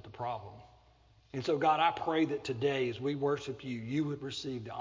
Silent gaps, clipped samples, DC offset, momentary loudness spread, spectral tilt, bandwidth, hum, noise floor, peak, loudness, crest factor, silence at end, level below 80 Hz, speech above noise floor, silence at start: none; under 0.1%; under 0.1%; 11 LU; -6 dB/octave; 7.6 kHz; none; -64 dBFS; -14 dBFS; -33 LUFS; 20 dB; 0 s; -66 dBFS; 31 dB; 0.05 s